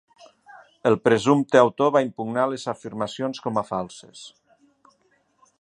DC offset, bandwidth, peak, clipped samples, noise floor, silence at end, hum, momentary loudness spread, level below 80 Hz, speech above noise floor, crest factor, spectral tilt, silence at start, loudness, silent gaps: under 0.1%; 10.5 kHz; 0 dBFS; under 0.1%; -65 dBFS; 1.3 s; none; 16 LU; -66 dBFS; 43 dB; 24 dB; -6 dB/octave; 0.55 s; -22 LUFS; none